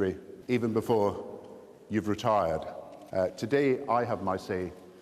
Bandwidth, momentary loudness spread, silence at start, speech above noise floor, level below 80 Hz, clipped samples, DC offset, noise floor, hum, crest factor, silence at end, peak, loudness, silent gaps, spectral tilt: 14.5 kHz; 16 LU; 0 s; 21 dB; -60 dBFS; under 0.1%; under 0.1%; -49 dBFS; none; 16 dB; 0 s; -14 dBFS; -30 LUFS; none; -7 dB/octave